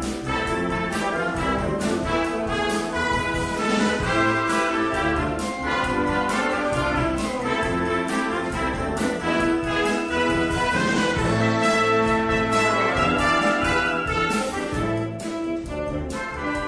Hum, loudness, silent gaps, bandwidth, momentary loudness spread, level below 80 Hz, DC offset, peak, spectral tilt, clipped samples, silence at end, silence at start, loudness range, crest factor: none; -23 LUFS; none; 11 kHz; 6 LU; -38 dBFS; under 0.1%; -8 dBFS; -5 dB/octave; under 0.1%; 0 s; 0 s; 3 LU; 14 dB